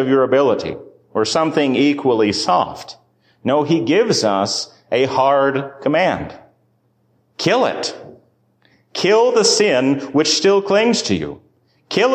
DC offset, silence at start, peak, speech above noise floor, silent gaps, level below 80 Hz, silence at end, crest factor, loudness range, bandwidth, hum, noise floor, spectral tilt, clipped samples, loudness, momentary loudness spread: under 0.1%; 0 s; -4 dBFS; 45 dB; none; -54 dBFS; 0 s; 14 dB; 5 LU; 15 kHz; none; -61 dBFS; -4 dB/octave; under 0.1%; -16 LUFS; 12 LU